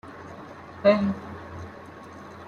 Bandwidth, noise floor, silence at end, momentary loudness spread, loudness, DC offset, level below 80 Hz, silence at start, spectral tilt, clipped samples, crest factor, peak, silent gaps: 7 kHz; -43 dBFS; 0 s; 22 LU; -24 LUFS; under 0.1%; -62 dBFS; 0.05 s; -7.5 dB/octave; under 0.1%; 22 dB; -6 dBFS; none